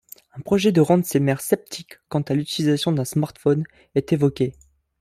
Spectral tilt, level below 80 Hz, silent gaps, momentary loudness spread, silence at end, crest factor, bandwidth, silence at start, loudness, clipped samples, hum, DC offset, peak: -6 dB/octave; -56 dBFS; none; 10 LU; 0.5 s; 18 dB; 16 kHz; 0.35 s; -21 LUFS; under 0.1%; none; under 0.1%; -4 dBFS